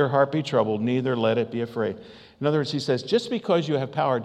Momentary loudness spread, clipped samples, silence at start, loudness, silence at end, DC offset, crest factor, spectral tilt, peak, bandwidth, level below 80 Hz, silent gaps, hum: 6 LU; under 0.1%; 0 s; -24 LUFS; 0 s; under 0.1%; 18 dB; -6.5 dB/octave; -6 dBFS; 10.5 kHz; -70 dBFS; none; none